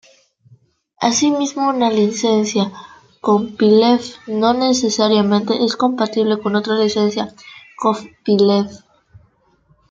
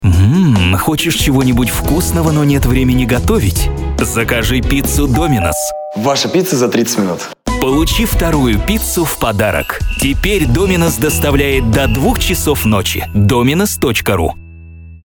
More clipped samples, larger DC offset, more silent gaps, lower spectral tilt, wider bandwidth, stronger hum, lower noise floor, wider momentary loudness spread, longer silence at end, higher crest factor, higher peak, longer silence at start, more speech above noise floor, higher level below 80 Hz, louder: neither; neither; neither; about the same, -4.5 dB/octave vs -5 dB/octave; second, 7.8 kHz vs over 20 kHz; neither; first, -57 dBFS vs -33 dBFS; first, 8 LU vs 5 LU; first, 1.15 s vs 0.1 s; about the same, 16 dB vs 12 dB; about the same, -2 dBFS vs 0 dBFS; first, 1 s vs 0 s; first, 41 dB vs 21 dB; second, -62 dBFS vs -22 dBFS; second, -16 LUFS vs -13 LUFS